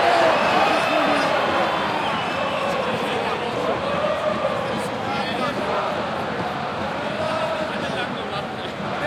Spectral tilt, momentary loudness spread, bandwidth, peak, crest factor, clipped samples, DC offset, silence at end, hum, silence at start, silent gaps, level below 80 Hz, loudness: -4.5 dB/octave; 8 LU; 15.5 kHz; -6 dBFS; 16 dB; under 0.1%; under 0.1%; 0 s; none; 0 s; none; -56 dBFS; -22 LUFS